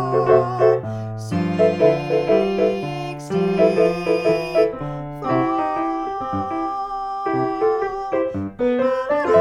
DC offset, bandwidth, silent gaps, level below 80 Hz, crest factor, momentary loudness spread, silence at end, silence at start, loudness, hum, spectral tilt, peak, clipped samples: under 0.1%; 12 kHz; none; -48 dBFS; 18 dB; 9 LU; 0 s; 0 s; -20 LUFS; none; -7.5 dB/octave; -2 dBFS; under 0.1%